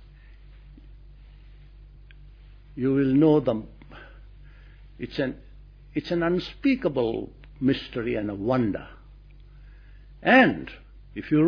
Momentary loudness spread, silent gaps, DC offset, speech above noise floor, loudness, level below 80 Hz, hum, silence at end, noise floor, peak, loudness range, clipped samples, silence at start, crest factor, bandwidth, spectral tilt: 25 LU; none; under 0.1%; 25 dB; -24 LUFS; -48 dBFS; none; 0 s; -48 dBFS; -4 dBFS; 5 LU; under 0.1%; 0.3 s; 22 dB; 5.4 kHz; -8.5 dB/octave